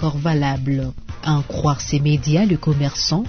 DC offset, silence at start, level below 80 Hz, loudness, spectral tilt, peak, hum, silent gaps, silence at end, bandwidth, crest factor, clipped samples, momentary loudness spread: under 0.1%; 0 s; -36 dBFS; -19 LUFS; -6 dB/octave; -4 dBFS; none; none; 0 s; 6.6 kHz; 14 dB; under 0.1%; 6 LU